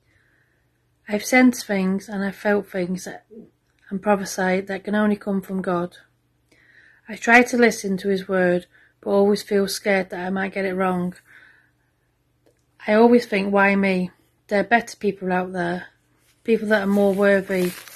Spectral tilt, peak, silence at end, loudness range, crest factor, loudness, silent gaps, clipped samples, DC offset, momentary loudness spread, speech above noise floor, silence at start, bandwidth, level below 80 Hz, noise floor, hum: -5.5 dB/octave; 0 dBFS; 0 s; 5 LU; 22 dB; -21 LUFS; none; under 0.1%; under 0.1%; 12 LU; 46 dB; 1.1 s; 13.5 kHz; -60 dBFS; -66 dBFS; none